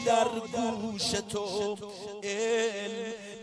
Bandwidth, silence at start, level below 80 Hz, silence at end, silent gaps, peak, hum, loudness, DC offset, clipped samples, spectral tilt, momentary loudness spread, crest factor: 11 kHz; 0 s; -64 dBFS; 0 s; none; -12 dBFS; none; -31 LUFS; under 0.1%; under 0.1%; -3 dB/octave; 10 LU; 18 dB